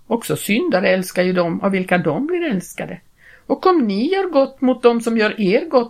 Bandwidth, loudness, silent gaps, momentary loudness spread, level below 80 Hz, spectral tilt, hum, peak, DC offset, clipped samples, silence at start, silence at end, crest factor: 16 kHz; -18 LUFS; none; 8 LU; -58 dBFS; -5.5 dB/octave; none; -2 dBFS; under 0.1%; under 0.1%; 0.1 s; 0 s; 16 dB